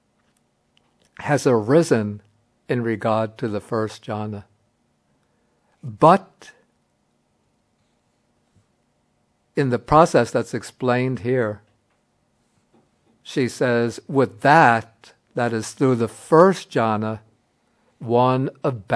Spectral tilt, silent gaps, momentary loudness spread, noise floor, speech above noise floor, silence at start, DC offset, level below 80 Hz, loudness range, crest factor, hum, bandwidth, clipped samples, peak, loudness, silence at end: -6.5 dB/octave; none; 15 LU; -67 dBFS; 48 dB; 1.2 s; under 0.1%; -56 dBFS; 8 LU; 22 dB; none; 11 kHz; under 0.1%; 0 dBFS; -20 LUFS; 0 s